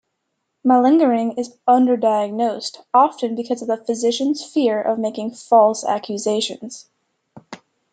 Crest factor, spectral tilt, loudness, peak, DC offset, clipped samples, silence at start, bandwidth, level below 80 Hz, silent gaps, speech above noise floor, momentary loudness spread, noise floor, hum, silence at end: 16 dB; -4.5 dB/octave; -18 LUFS; -2 dBFS; under 0.1%; under 0.1%; 0.65 s; 9.4 kHz; -74 dBFS; none; 57 dB; 10 LU; -75 dBFS; none; 0.35 s